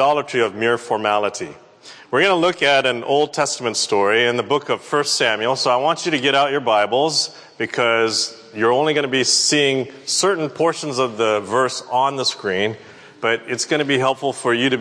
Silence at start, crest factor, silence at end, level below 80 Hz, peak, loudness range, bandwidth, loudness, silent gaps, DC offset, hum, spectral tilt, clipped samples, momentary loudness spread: 0 s; 16 dB; 0 s; -70 dBFS; -4 dBFS; 3 LU; 11 kHz; -18 LUFS; none; under 0.1%; none; -2.5 dB/octave; under 0.1%; 6 LU